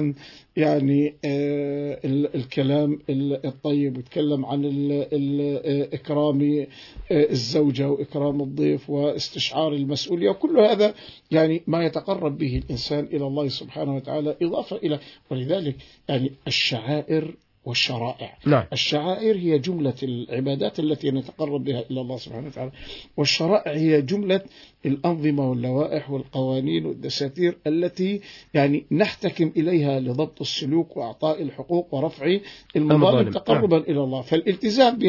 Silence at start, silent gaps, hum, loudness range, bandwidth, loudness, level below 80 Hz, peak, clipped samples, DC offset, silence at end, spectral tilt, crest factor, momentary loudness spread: 0 s; none; none; 4 LU; 6 kHz; -23 LUFS; -54 dBFS; -2 dBFS; under 0.1%; under 0.1%; 0 s; -6.5 dB/octave; 20 dB; 8 LU